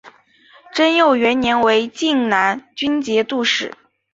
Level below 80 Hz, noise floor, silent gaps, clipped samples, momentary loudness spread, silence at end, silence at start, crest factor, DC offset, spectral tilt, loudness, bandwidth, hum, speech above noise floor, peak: -56 dBFS; -50 dBFS; none; under 0.1%; 7 LU; 0.4 s; 0.05 s; 16 dB; under 0.1%; -3.5 dB/octave; -17 LUFS; 8 kHz; none; 34 dB; -2 dBFS